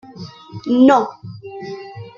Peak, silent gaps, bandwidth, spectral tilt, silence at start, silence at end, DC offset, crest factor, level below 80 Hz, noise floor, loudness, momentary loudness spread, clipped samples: -2 dBFS; none; 7.4 kHz; -7 dB/octave; 0.2 s; 0.1 s; under 0.1%; 18 dB; -58 dBFS; -36 dBFS; -14 LUFS; 23 LU; under 0.1%